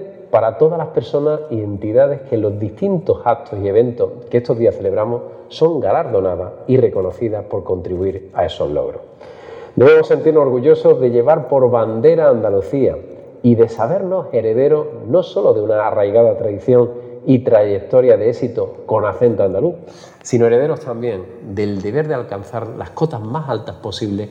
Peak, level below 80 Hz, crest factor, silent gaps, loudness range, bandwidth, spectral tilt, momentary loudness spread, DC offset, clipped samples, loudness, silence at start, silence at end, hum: 0 dBFS; -54 dBFS; 14 dB; none; 6 LU; 7.8 kHz; -8 dB/octave; 12 LU; under 0.1%; under 0.1%; -16 LUFS; 0 s; 0 s; none